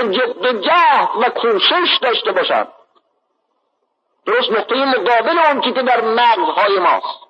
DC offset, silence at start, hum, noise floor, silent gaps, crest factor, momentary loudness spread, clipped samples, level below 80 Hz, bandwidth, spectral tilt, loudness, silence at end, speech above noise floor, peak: under 0.1%; 0 s; none; -68 dBFS; none; 12 dB; 5 LU; under 0.1%; -80 dBFS; 7 kHz; -4.5 dB/octave; -14 LUFS; 0.15 s; 54 dB; -2 dBFS